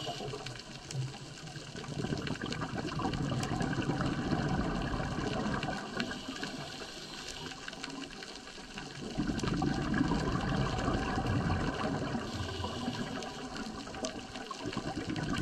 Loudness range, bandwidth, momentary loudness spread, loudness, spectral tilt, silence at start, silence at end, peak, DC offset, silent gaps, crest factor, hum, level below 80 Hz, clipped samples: 6 LU; 13 kHz; 10 LU; -36 LUFS; -5.5 dB/octave; 0 s; 0 s; -18 dBFS; under 0.1%; none; 18 dB; none; -48 dBFS; under 0.1%